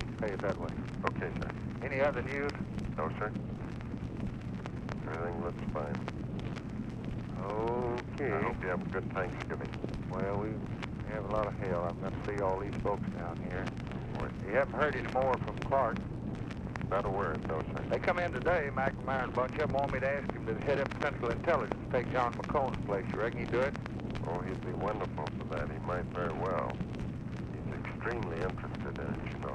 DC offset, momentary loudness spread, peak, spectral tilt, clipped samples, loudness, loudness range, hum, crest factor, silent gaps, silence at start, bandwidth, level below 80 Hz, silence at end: under 0.1%; 8 LU; -10 dBFS; -7.5 dB/octave; under 0.1%; -35 LUFS; 5 LU; none; 24 dB; none; 0 s; 10 kHz; -48 dBFS; 0 s